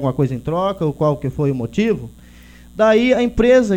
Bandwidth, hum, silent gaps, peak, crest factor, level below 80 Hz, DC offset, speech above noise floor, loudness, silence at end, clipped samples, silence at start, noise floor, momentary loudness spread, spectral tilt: 16 kHz; 60 Hz at -40 dBFS; none; -2 dBFS; 14 dB; -38 dBFS; under 0.1%; 26 dB; -17 LUFS; 0 s; under 0.1%; 0 s; -42 dBFS; 7 LU; -7 dB/octave